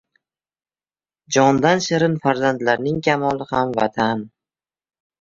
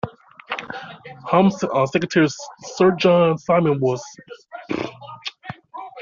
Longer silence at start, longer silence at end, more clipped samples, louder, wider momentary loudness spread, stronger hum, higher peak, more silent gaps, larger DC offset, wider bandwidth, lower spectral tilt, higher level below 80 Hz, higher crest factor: first, 1.3 s vs 0.05 s; first, 0.95 s vs 0 s; neither; about the same, -19 LUFS vs -19 LUFS; second, 6 LU vs 20 LU; neither; about the same, -2 dBFS vs -4 dBFS; neither; neither; about the same, 7.6 kHz vs 7.4 kHz; about the same, -5 dB/octave vs -5 dB/octave; about the same, -56 dBFS vs -60 dBFS; about the same, 18 dB vs 18 dB